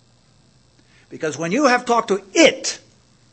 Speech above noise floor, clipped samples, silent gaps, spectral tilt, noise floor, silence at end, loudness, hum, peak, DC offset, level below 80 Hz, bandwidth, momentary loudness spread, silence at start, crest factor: 38 dB; under 0.1%; none; -3 dB/octave; -56 dBFS; 0.55 s; -18 LUFS; none; 0 dBFS; under 0.1%; -62 dBFS; 8.8 kHz; 13 LU; 1.1 s; 20 dB